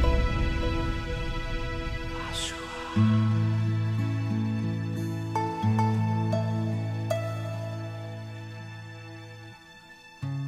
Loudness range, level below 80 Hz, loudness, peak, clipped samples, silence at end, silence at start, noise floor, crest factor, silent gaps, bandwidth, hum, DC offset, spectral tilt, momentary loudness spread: 7 LU; -36 dBFS; -29 LUFS; -12 dBFS; under 0.1%; 0 s; 0 s; -50 dBFS; 16 dB; none; 11 kHz; none; under 0.1%; -6.5 dB/octave; 17 LU